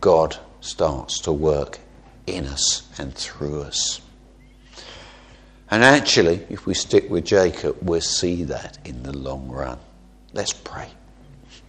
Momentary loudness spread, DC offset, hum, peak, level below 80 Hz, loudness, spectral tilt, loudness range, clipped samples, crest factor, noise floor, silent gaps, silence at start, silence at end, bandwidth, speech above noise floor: 20 LU; under 0.1%; none; 0 dBFS; -42 dBFS; -21 LUFS; -3.5 dB/octave; 8 LU; under 0.1%; 22 dB; -48 dBFS; none; 0 s; 0.1 s; 10.5 kHz; 27 dB